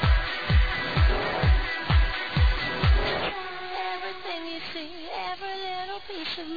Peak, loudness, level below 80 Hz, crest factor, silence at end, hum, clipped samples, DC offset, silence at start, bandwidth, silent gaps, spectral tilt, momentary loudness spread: -10 dBFS; -27 LUFS; -28 dBFS; 16 dB; 0 s; none; under 0.1%; 0.7%; 0 s; 5 kHz; none; -7 dB/octave; 10 LU